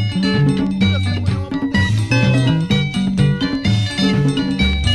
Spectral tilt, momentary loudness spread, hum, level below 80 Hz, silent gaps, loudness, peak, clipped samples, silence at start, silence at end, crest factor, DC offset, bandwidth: -6 dB/octave; 4 LU; none; -30 dBFS; none; -17 LUFS; -2 dBFS; under 0.1%; 0 s; 0 s; 14 dB; 0.3%; 11.5 kHz